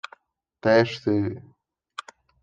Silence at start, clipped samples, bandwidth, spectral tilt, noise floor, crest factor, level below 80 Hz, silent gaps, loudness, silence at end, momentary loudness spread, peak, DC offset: 0.65 s; under 0.1%; 9.2 kHz; -6.5 dB/octave; -61 dBFS; 20 dB; -68 dBFS; none; -23 LUFS; 1 s; 21 LU; -6 dBFS; under 0.1%